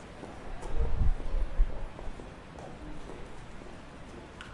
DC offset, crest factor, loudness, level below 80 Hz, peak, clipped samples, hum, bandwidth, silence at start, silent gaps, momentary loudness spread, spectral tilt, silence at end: under 0.1%; 18 dB; -40 LUFS; -34 dBFS; -14 dBFS; under 0.1%; none; 10 kHz; 0 s; none; 14 LU; -6.5 dB/octave; 0 s